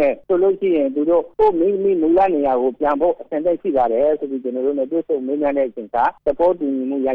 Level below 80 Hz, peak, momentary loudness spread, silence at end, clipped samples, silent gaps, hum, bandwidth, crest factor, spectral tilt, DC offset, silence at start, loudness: -50 dBFS; -6 dBFS; 6 LU; 0 s; under 0.1%; none; none; 4.7 kHz; 12 dB; -9 dB/octave; under 0.1%; 0 s; -18 LUFS